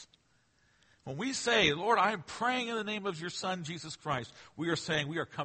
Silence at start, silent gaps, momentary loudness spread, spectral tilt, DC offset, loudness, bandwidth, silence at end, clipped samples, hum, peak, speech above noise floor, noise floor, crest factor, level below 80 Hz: 0 s; none; 13 LU; -3.5 dB/octave; under 0.1%; -32 LUFS; 8.8 kHz; 0 s; under 0.1%; none; -12 dBFS; 38 dB; -71 dBFS; 22 dB; -66 dBFS